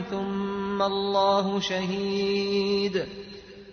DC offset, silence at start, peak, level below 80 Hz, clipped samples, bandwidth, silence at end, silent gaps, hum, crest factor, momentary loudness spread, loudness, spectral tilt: under 0.1%; 0 s; -12 dBFS; -58 dBFS; under 0.1%; 6.6 kHz; 0 s; none; none; 16 dB; 12 LU; -26 LUFS; -5.5 dB/octave